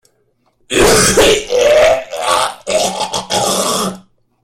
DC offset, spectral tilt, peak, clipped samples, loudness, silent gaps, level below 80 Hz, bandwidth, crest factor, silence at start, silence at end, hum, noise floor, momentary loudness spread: under 0.1%; -2.5 dB/octave; 0 dBFS; under 0.1%; -12 LUFS; none; -36 dBFS; 16.5 kHz; 14 dB; 0.7 s; 0.45 s; none; -59 dBFS; 9 LU